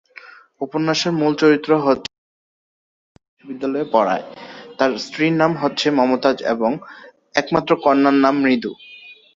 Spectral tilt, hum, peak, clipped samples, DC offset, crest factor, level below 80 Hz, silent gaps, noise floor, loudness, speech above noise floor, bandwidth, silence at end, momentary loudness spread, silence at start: -5.5 dB/octave; none; 0 dBFS; under 0.1%; under 0.1%; 18 dB; -60 dBFS; 2.18-3.15 s, 3.28-3.37 s; -43 dBFS; -18 LUFS; 26 dB; 7.6 kHz; 0.2 s; 16 LU; 0.25 s